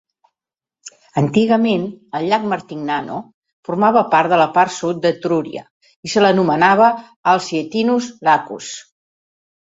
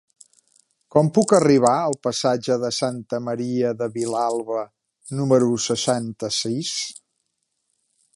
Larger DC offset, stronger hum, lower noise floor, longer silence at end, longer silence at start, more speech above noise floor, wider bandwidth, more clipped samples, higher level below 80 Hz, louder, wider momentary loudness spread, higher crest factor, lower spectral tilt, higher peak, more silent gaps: neither; neither; first, -89 dBFS vs -75 dBFS; second, 0.8 s vs 1.25 s; about the same, 0.85 s vs 0.95 s; first, 73 dB vs 54 dB; second, 8 kHz vs 11.5 kHz; neither; about the same, -60 dBFS vs -64 dBFS; first, -16 LUFS vs -21 LUFS; first, 15 LU vs 11 LU; about the same, 16 dB vs 20 dB; about the same, -5.5 dB/octave vs -5 dB/octave; about the same, 0 dBFS vs -2 dBFS; first, 3.34-3.42 s, 3.53-3.63 s, 5.70-5.81 s, 5.96-6.03 s, 7.16-7.23 s vs none